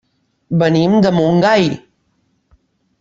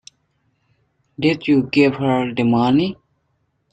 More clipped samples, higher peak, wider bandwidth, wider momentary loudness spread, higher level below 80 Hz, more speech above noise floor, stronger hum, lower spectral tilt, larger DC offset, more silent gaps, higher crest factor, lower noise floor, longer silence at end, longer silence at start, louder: neither; about the same, -2 dBFS vs -2 dBFS; second, 7.6 kHz vs 8.8 kHz; about the same, 8 LU vs 6 LU; about the same, -52 dBFS vs -56 dBFS; about the same, 50 dB vs 51 dB; neither; about the same, -7 dB/octave vs -7.5 dB/octave; neither; neither; about the same, 14 dB vs 16 dB; second, -63 dBFS vs -67 dBFS; first, 1.2 s vs 0.8 s; second, 0.5 s vs 1.2 s; first, -13 LUFS vs -17 LUFS